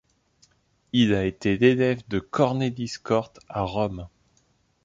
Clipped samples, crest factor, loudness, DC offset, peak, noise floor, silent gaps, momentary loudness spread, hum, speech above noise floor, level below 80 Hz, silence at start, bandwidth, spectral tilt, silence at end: under 0.1%; 20 dB; -24 LUFS; under 0.1%; -6 dBFS; -66 dBFS; none; 12 LU; none; 42 dB; -50 dBFS; 0.95 s; 7.8 kHz; -6.5 dB/octave; 0.75 s